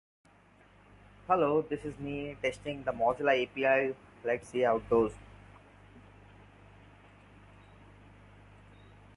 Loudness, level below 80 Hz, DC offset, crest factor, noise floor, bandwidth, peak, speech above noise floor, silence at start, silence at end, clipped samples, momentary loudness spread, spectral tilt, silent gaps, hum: -31 LUFS; -60 dBFS; under 0.1%; 20 dB; -61 dBFS; 11.5 kHz; -14 dBFS; 31 dB; 1.3 s; 3.15 s; under 0.1%; 11 LU; -6 dB/octave; none; 50 Hz at -55 dBFS